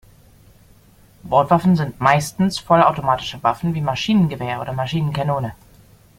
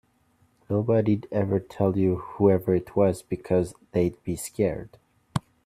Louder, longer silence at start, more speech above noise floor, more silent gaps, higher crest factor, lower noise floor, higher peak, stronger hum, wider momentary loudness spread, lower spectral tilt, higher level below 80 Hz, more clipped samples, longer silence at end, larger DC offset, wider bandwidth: first, -19 LUFS vs -26 LUFS; first, 1.25 s vs 0.7 s; second, 32 dB vs 40 dB; neither; about the same, 18 dB vs 20 dB; second, -50 dBFS vs -65 dBFS; first, -2 dBFS vs -6 dBFS; neither; about the same, 9 LU vs 10 LU; second, -6.5 dB/octave vs -8 dB/octave; first, -48 dBFS vs -54 dBFS; neither; first, 0.65 s vs 0.25 s; neither; first, 16 kHz vs 14.5 kHz